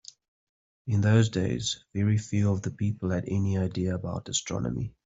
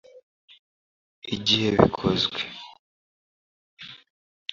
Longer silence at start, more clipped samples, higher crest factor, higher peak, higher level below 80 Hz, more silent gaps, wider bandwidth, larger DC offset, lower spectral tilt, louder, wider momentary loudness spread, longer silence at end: first, 0.85 s vs 0.15 s; neither; second, 20 dB vs 26 dB; second, -8 dBFS vs -2 dBFS; about the same, -56 dBFS vs -52 dBFS; second, none vs 0.23-0.48 s, 0.59-1.22 s, 2.79-3.77 s; about the same, 8 kHz vs 7.6 kHz; neither; about the same, -5.5 dB/octave vs -5 dB/octave; second, -28 LUFS vs -23 LUFS; second, 8 LU vs 22 LU; second, 0.15 s vs 0.55 s